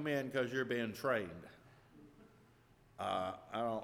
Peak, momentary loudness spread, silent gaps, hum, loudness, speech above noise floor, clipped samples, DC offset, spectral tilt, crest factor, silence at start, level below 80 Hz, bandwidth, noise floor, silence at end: -22 dBFS; 11 LU; none; none; -39 LUFS; 28 dB; under 0.1%; under 0.1%; -5.5 dB/octave; 18 dB; 0 s; -74 dBFS; 17.5 kHz; -67 dBFS; 0 s